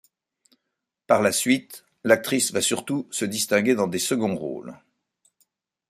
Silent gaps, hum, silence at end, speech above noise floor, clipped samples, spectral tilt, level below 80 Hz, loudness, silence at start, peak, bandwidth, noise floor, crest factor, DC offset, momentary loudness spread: none; none; 1.15 s; 59 dB; under 0.1%; -3.5 dB/octave; -68 dBFS; -23 LUFS; 1.1 s; -4 dBFS; 16 kHz; -82 dBFS; 22 dB; under 0.1%; 12 LU